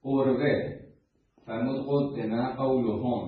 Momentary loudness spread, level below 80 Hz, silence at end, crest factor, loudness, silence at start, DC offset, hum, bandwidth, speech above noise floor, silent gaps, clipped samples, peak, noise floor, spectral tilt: 11 LU; -60 dBFS; 0 s; 16 dB; -28 LUFS; 0.05 s; under 0.1%; none; 5 kHz; 37 dB; none; under 0.1%; -12 dBFS; -65 dBFS; -11 dB/octave